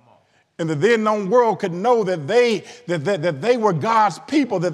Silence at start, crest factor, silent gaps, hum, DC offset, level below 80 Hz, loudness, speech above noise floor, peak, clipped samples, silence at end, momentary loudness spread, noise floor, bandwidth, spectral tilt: 0.6 s; 16 dB; none; none; under 0.1%; -74 dBFS; -19 LUFS; 39 dB; -4 dBFS; under 0.1%; 0 s; 7 LU; -57 dBFS; 11 kHz; -6 dB/octave